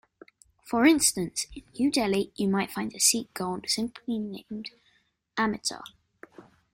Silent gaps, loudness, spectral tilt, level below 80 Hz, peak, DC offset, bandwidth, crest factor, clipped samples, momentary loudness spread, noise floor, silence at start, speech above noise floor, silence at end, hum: none; -27 LUFS; -3 dB/octave; -60 dBFS; -6 dBFS; under 0.1%; 16.5 kHz; 22 dB; under 0.1%; 16 LU; -69 dBFS; 0.65 s; 41 dB; 0.35 s; none